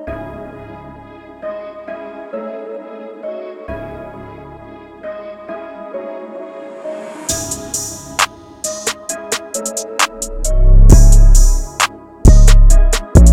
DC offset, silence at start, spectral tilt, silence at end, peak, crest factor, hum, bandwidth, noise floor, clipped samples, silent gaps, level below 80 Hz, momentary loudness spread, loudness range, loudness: under 0.1%; 0 s; -4.5 dB/octave; 0 s; 0 dBFS; 12 dB; none; 14.5 kHz; -36 dBFS; 0.1%; none; -14 dBFS; 22 LU; 17 LU; -15 LUFS